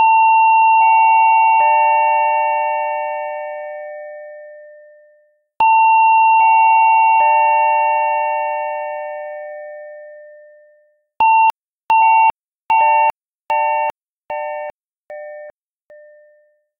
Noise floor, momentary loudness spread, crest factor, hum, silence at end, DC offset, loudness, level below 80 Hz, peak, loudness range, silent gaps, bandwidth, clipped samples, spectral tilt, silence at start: -56 dBFS; 20 LU; 12 dB; none; 1.3 s; under 0.1%; -13 LUFS; -68 dBFS; -4 dBFS; 11 LU; 11.57-11.61 s, 11.77-11.89 s, 12.48-12.67 s, 13.29-13.40 s, 14.02-14.29 s, 14.75-15.05 s; 3.7 kHz; under 0.1%; -2 dB/octave; 0 s